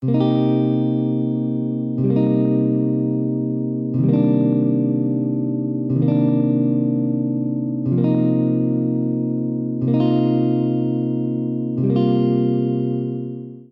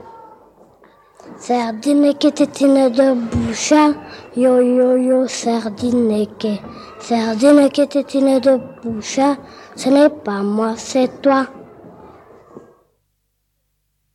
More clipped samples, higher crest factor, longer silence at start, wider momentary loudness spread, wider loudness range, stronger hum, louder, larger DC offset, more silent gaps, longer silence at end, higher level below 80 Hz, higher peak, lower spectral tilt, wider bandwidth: neither; about the same, 12 dB vs 16 dB; about the same, 0 s vs 0.05 s; second, 6 LU vs 12 LU; second, 1 LU vs 5 LU; second, none vs 50 Hz at -55 dBFS; second, -19 LUFS vs -16 LUFS; neither; neither; second, 0.1 s vs 1.55 s; second, -62 dBFS vs -52 dBFS; second, -6 dBFS vs 0 dBFS; first, -12.5 dB/octave vs -5 dB/octave; second, 4.8 kHz vs 12 kHz